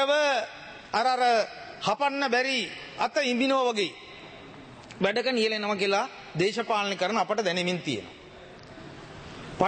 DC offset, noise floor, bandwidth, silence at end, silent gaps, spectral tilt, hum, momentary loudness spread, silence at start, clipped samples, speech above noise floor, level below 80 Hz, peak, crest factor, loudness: under 0.1%; -47 dBFS; 8.8 kHz; 0 s; none; -4 dB/octave; none; 21 LU; 0 s; under 0.1%; 21 dB; -62 dBFS; -6 dBFS; 22 dB; -27 LUFS